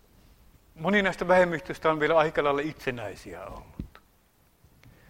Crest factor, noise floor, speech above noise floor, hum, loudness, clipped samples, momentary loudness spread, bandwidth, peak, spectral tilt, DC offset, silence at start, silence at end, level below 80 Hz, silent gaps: 22 dB; -64 dBFS; 38 dB; none; -25 LUFS; under 0.1%; 20 LU; 16 kHz; -6 dBFS; -6 dB/octave; under 0.1%; 0.75 s; 1.25 s; -52 dBFS; none